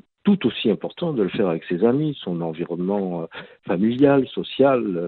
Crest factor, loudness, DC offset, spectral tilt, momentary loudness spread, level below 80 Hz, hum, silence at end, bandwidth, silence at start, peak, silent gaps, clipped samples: 18 dB; -22 LUFS; under 0.1%; -10.5 dB/octave; 10 LU; -60 dBFS; none; 0 s; 4.5 kHz; 0.25 s; -4 dBFS; none; under 0.1%